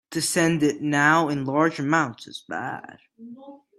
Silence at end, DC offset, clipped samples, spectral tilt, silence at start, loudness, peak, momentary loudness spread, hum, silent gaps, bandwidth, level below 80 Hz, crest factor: 0.2 s; under 0.1%; under 0.1%; -4.5 dB/octave; 0.1 s; -22 LUFS; -4 dBFS; 19 LU; none; none; 15 kHz; -64 dBFS; 20 dB